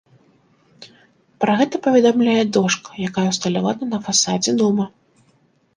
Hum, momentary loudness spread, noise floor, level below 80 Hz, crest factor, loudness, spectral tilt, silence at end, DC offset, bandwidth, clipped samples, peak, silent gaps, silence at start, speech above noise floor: none; 8 LU; -59 dBFS; -62 dBFS; 18 dB; -18 LUFS; -4 dB/octave; 0.9 s; under 0.1%; 10.5 kHz; under 0.1%; -2 dBFS; none; 0.8 s; 42 dB